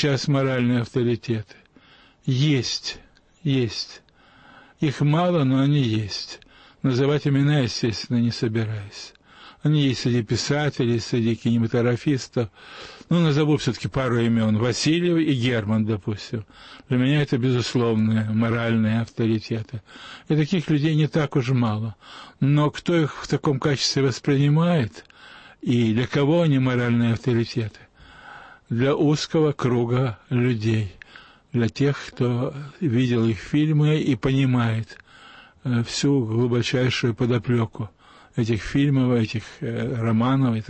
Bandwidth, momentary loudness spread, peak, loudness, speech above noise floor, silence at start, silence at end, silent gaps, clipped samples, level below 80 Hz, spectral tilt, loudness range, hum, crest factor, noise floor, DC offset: 8.6 kHz; 11 LU; -10 dBFS; -22 LUFS; 32 dB; 0 s; 0.05 s; none; under 0.1%; -52 dBFS; -6.5 dB/octave; 2 LU; none; 12 dB; -53 dBFS; under 0.1%